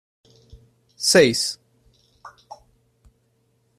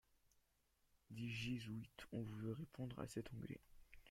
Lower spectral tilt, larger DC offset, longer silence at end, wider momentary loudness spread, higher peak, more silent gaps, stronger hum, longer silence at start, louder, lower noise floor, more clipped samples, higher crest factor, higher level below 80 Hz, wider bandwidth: second, -3 dB/octave vs -6 dB/octave; neither; first, 1.5 s vs 0 s; first, 24 LU vs 9 LU; first, -2 dBFS vs -32 dBFS; neither; neither; about the same, 1 s vs 1.1 s; first, -18 LUFS vs -51 LUFS; second, -66 dBFS vs -82 dBFS; neither; about the same, 22 dB vs 18 dB; first, -58 dBFS vs -70 dBFS; second, 14 kHz vs 16.5 kHz